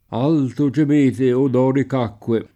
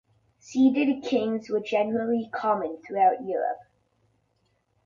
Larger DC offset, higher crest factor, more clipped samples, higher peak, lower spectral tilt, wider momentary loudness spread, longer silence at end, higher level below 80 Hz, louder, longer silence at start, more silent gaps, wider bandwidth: neither; second, 10 dB vs 16 dB; neither; about the same, -8 dBFS vs -10 dBFS; first, -8.5 dB/octave vs -6 dB/octave; second, 6 LU vs 9 LU; second, 0.1 s vs 1.25 s; first, -58 dBFS vs -70 dBFS; first, -18 LUFS vs -26 LUFS; second, 0.1 s vs 0.45 s; neither; first, 10.5 kHz vs 7.4 kHz